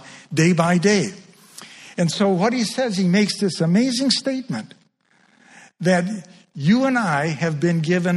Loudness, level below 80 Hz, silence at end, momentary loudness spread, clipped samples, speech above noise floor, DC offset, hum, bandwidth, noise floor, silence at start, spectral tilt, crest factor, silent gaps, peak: -20 LUFS; -62 dBFS; 0 s; 13 LU; under 0.1%; 41 dB; under 0.1%; none; 12 kHz; -60 dBFS; 0.05 s; -5.5 dB/octave; 18 dB; none; -2 dBFS